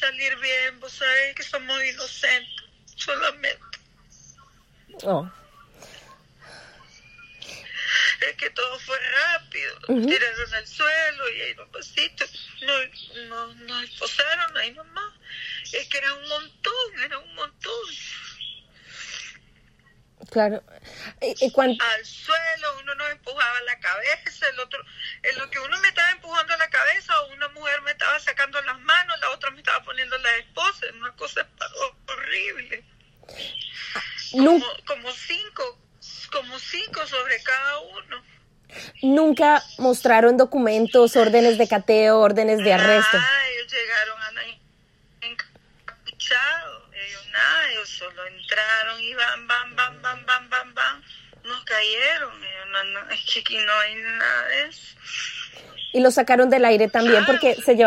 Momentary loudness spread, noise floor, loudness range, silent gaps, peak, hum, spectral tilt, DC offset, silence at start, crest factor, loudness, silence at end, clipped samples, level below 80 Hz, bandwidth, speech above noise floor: 18 LU; -59 dBFS; 12 LU; none; -2 dBFS; none; -3 dB/octave; under 0.1%; 0 s; 22 dB; -21 LUFS; 0 s; under 0.1%; -60 dBFS; 14.5 kHz; 36 dB